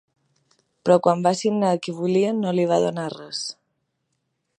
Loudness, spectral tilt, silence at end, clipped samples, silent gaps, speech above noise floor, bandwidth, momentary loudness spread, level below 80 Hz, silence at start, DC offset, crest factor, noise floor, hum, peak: -22 LUFS; -6 dB/octave; 1.05 s; under 0.1%; none; 54 dB; 10.5 kHz; 11 LU; -70 dBFS; 0.85 s; under 0.1%; 20 dB; -75 dBFS; none; -2 dBFS